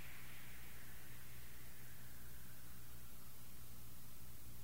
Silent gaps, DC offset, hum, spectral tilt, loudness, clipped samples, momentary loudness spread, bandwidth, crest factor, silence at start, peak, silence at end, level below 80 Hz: none; 0.6%; none; -3.5 dB/octave; -57 LUFS; under 0.1%; 2 LU; 16 kHz; 14 dB; 0 s; -38 dBFS; 0 s; -66 dBFS